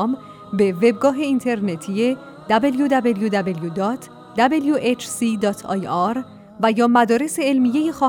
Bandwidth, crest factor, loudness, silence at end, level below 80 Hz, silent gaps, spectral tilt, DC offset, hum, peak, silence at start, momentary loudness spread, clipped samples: 17.5 kHz; 16 dB; -20 LUFS; 0 s; -60 dBFS; none; -5.5 dB/octave; under 0.1%; none; -4 dBFS; 0 s; 8 LU; under 0.1%